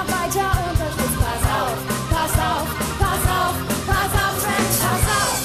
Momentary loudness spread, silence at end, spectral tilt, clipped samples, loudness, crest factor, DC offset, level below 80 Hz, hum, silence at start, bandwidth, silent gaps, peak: 4 LU; 0 s; -4 dB/octave; under 0.1%; -20 LUFS; 16 dB; under 0.1%; -28 dBFS; none; 0 s; 14 kHz; none; -4 dBFS